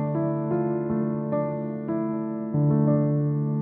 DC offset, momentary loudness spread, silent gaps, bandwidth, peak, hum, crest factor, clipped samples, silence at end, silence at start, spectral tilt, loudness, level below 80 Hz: under 0.1%; 7 LU; none; 2.6 kHz; -12 dBFS; none; 12 dB; under 0.1%; 0 s; 0 s; -15 dB/octave; -25 LUFS; -60 dBFS